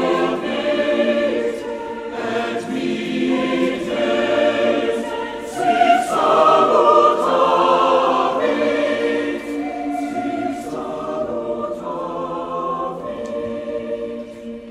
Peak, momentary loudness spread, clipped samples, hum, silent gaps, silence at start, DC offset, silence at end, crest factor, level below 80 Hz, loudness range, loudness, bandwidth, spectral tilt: -2 dBFS; 13 LU; under 0.1%; none; none; 0 s; under 0.1%; 0 s; 18 dB; -54 dBFS; 10 LU; -19 LUFS; 14.5 kHz; -5 dB/octave